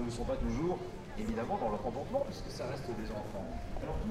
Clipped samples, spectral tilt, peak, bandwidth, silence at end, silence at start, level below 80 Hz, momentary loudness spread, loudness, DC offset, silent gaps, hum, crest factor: under 0.1%; -6.5 dB/octave; -22 dBFS; 15 kHz; 0 s; 0 s; -44 dBFS; 7 LU; -38 LUFS; under 0.1%; none; none; 14 dB